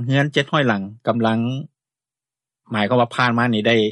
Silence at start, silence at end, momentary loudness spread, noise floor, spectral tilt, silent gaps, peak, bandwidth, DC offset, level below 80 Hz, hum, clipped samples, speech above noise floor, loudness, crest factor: 0 s; 0 s; 7 LU; -90 dBFS; -6.5 dB/octave; none; -4 dBFS; 10.5 kHz; under 0.1%; -62 dBFS; none; under 0.1%; 71 dB; -19 LUFS; 16 dB